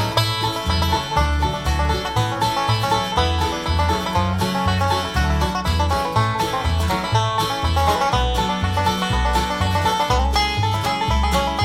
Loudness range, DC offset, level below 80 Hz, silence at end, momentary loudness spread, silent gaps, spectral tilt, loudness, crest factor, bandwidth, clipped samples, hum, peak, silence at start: 1 LU; under 0.1%; -26 dBFS; 0 s; 2 LU; none; -4.5 dB/octave; -20 LUFS; 14 dB; 16.5 kHz; under 0.1%; none; -6 dBFS; 0 s